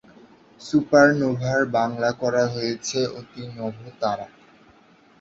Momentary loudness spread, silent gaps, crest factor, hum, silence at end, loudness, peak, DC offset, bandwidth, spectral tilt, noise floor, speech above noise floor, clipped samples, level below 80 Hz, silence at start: 17 LU; none; 20 dB; none; 0.95 s; -22 LUFS; -2 dBFS; under 0.1%; 8 kHz; -5.5 dB/octave; -54 dBFS; 32 dB; under 0.1%; -60 dBFS; 0.6 s